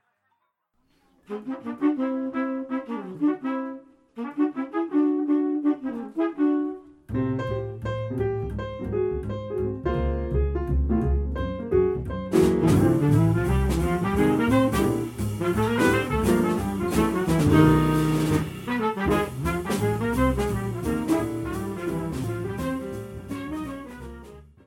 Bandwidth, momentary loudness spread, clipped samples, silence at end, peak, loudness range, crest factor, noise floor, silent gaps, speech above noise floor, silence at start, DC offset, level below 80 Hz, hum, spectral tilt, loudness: 17 kHz; 13 LU; under 0.1%; 0.25 s; -4 dBFS; 7 LU; 20 dB; -73 dBFS; none; 46 dB; 1.3 s; under 0.1%; -36 dBFS; none; -7 dB/octave; -25 LUFS